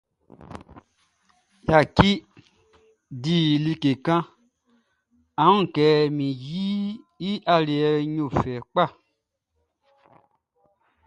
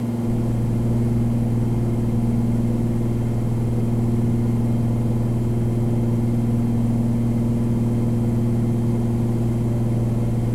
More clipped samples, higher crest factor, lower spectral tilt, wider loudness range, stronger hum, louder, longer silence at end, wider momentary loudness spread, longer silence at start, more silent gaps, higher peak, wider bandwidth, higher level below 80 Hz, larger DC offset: neither; first, 24 dB vs 10 dB; second, -7 dB/octave vs -9.5 dB/octave; first, 4 LU vs 1 LU; neither; about the same, -22 LUFS vs -21 LUFS; first, 2.15 s vs 0 s; first, 15 LU vs 1 LU; first, 0.4 s vs 0 s; neither; first, 0 dBFS vs -10 dBFS; second, 9.8 kHz vs 12.5 kHz; second, -48 dBFS vs -32 dBFS; neither